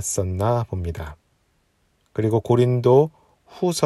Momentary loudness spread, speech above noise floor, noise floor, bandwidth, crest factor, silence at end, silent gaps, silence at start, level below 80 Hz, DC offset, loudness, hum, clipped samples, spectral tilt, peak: 15 LU; 45 dB; -65 dBFS; 13 kHz; 18 dB; 0 s; none; 0 s; -46 dBFS; under 0.1%; -21 LUFS; none; under 0.1%; -6.5 dB/octave; -4 dBFS